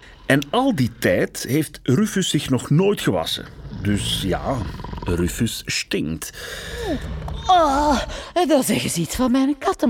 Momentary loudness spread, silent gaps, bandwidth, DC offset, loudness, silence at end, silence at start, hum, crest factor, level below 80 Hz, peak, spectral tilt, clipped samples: 10 LU; none; 18 kHz; under 0.1%; -21 LUFS; 0 s; 0 s; none; 18 dB; -38 dBFS; -2 dBFS; -5 dB/octave; under 0.1%